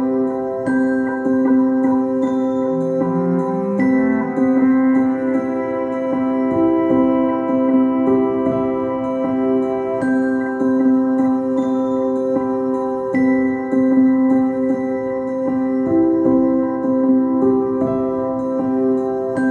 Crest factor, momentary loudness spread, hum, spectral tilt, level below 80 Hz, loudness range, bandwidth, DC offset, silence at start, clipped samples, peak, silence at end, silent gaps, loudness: 12 dB; 5 LU; none; -9 dB/octave; -54 dBFS; 1 LU; 3.8 kHz; under 0.1%; 0 s; under 0.1%; -4 dBFS; 0 s; none; -17 LUFS